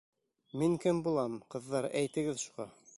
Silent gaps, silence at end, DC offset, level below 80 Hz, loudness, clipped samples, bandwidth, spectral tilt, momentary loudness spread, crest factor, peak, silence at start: none; 0.25 s; under 0.1%; -68 dBFS; -34 LUFS; under 0.1%; 11.5 kHz; -5.5 dB/octave; 11 LU; 16 dB; -18 dBFS; 0.55 s